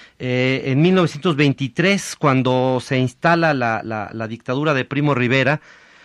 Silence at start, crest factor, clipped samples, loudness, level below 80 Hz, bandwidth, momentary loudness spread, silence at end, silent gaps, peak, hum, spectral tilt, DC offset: 0 s; 16 dB; under 0.1%; -18 LUFS; -56 dBFS; 12.5 kHz; 8 LU; 0.45 s; none; -2 dBFS; none; -6 dB/octave; under 0.1%